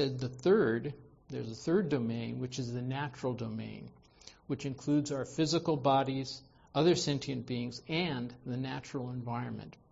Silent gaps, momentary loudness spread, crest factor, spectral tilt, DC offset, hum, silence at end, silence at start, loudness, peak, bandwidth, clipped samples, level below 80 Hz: none; 14 LU; 18 dB; -6 dB/octave; under 0.1%; none; 0.2 s; 0 s; -34 LUFS; -16 dBFS; 8 kHz; under 0.1%; -64 dBFS